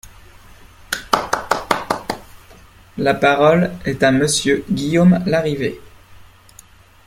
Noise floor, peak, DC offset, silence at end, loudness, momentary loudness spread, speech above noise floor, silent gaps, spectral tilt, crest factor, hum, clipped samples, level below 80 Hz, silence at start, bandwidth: -46 dBFS; 0 dBFS; under 0.1%; 0.85 s; -17 LUFS; 13 LU; 30 dB; none; -5 dB/octave; 18 dB; none; under 0.1%; -46 dBFS; 0.05 s; 16 kHz